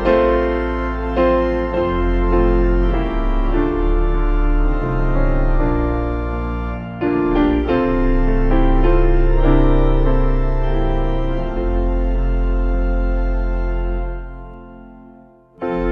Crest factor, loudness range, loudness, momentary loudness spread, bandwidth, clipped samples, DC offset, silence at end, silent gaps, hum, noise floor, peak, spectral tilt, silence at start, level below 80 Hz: 14 dB; 5 LU; -19 LUFS; 7 LU; 4.4 kHz; under 0.1%; under 0.1%; 0 s; none; none; -45 dBFS; -2 dBFS; -9.5 dB/octave; 0 s; -18 dBFS